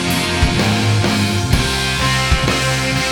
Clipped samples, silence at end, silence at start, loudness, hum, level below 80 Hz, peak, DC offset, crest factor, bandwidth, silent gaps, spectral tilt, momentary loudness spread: under 0.1%; 0 s; 0 s; -15 LUFS; none; -26 dBFS; 0 dBFS; under 0.1%; 16 dB; 19.5 kHz; none; -4 dB/octave; 1 LU